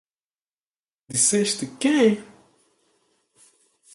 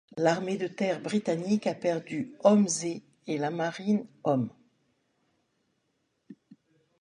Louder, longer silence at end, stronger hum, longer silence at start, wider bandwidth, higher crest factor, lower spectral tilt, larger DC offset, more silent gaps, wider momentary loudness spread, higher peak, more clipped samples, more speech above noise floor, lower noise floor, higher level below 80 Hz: first, -21 LUFS vs -29 LUFS; first, 1.7 s vs 0.7 s; neither; first, 1.1 s vs 0.15 s; about the same, 11.5 kHz vs 10.5 kHz; about the same, 20 dB vs 22 dB; second, -3 dB/octave vs -5.5 dB/octave; neither; neither; second, 8 LU vs 11 LU; about the same, -6 dBFS vs -8 dBFS; neither; first, over 69 dB vs 48 dB; first, under -90 dBFS vs -76 dBFS; first, -68 dBFS vs -76 dBFS